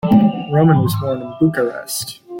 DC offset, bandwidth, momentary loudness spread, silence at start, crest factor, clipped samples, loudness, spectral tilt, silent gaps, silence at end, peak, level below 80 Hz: under 0.1%; 17 kHz; 10 LU; 0.05 s; 14 dB; under 0.1%; -17 LUFS; -6.5 dB/octave; none; 0 s; -2 dBFS; -48 dBFS